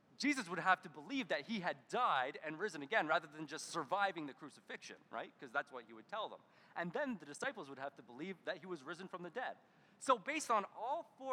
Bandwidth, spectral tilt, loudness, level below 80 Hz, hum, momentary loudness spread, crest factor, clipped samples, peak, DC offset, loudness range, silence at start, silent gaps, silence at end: 16 kHz; -3.5 dB/octave; -41 LUFS; under -90 dBFS; none; 14 LU; 24 dB; under 0.1%; -18 dBFS; under 0.1%; 7 LU; 0.2 s; none; 0 s